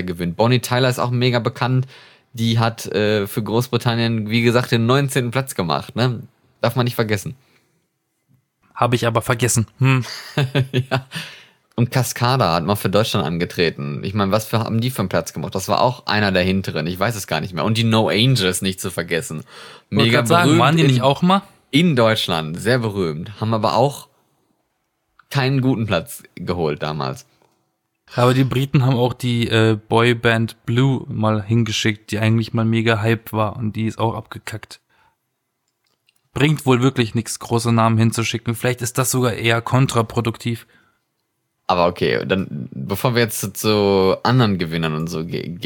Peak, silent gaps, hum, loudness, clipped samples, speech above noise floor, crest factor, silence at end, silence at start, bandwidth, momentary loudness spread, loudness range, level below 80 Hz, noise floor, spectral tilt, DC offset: -2 dBFS; none; none; -19 LUFS; under 0.1%; 55 dB; 18 dB; 0 s; 0 s; 18 kHz; 10 LU; 6 LU; -52 dBFS; -73 dBFS; -5.5 dB/octave; under 0.1%